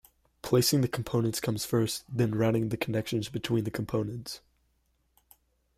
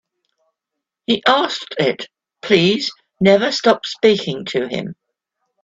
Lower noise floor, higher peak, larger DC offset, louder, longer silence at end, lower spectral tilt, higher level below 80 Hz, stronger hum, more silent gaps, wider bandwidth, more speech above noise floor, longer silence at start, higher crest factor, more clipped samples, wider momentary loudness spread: second, -72 dBFS vs -81 dBFS; second, -12 dBFS vs 0 dBFS; neither; second, -29 LUFS vs -17 LUFS; first, 1.4 s vs 0.7 s; about the same, -5.5 dB/octave vs -5 dB/octave; about the same, -58 dBFS vs -60 dBFS; neither; neither; first, 16 kHz vs 8 kHz; second, 44 dB vs 65 dB; second, 0.45 s vs 1.1 s; about the same, 18 dB vs 18 dB; neither; second, 10 LU vs 15 LU